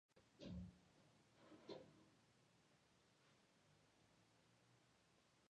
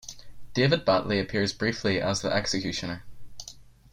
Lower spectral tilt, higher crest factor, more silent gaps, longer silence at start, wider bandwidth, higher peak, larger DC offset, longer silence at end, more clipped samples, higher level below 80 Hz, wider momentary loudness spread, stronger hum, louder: first, -6 dB/octave vs -4.5 dB/octave; about the same, 22 dB vs 18 dB; neither; about the same, 0.1 s vs 0.05 s; second, 9.6 kHz vs 16 kHz; second, -44 dBFS vs -10 dBFS; neither; second, 0 s vs 0.25 s; neither; second, -76 dBFS vs -52 dBFS; second, 9 LU vs 20 LU; neither; second, -60 LUFS vs -26 LUFS